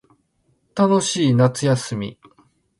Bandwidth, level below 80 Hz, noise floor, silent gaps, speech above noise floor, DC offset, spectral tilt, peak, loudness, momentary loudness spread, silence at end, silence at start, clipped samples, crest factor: 11.5 kHz; -58 dBFS; -65 dBFS; none; 47 dB; under 0.1%; -5.5 dB/octave; -2 dBFS; -19 LUFS; 14 LU; 0.65 s; 0.75 s; under 0.1%; 18 dB